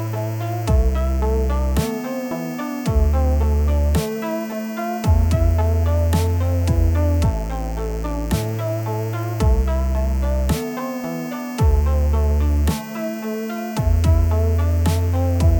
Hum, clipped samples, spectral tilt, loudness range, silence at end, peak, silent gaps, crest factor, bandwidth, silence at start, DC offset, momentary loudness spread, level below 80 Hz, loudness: none; under 0.1%; -7 dB/octave; 3 LU; 0 s; -6 dBFS; none; 12 dB; over 20 kHz; 0 s; under 0.1%; 8 LU; -22 dBFS; -21 LUFS